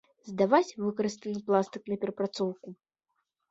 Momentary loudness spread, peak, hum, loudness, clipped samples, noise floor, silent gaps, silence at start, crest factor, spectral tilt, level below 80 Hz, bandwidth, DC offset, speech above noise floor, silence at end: 13 LU; -8 dBFS; none; -30 LUFS; under 0.1%; -82 dBFS; none; 0.25 s; 22 dB; -6 dB/octave; -74 dBFS; 8 kHz; under 0.1%; 52 dB; 0.75 s